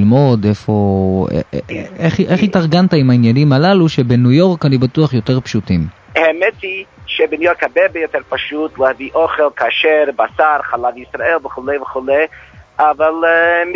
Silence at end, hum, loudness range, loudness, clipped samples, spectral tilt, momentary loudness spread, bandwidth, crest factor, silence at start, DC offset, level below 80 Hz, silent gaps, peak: 0 s; none; 4 LU; -14 LUFS; under 0.1%; -7.5 dB/octave; 9 LU; 7.4 kHz; 14 dB; 0 s; under 0.1%; -40 dBFS; none; 0 dBFS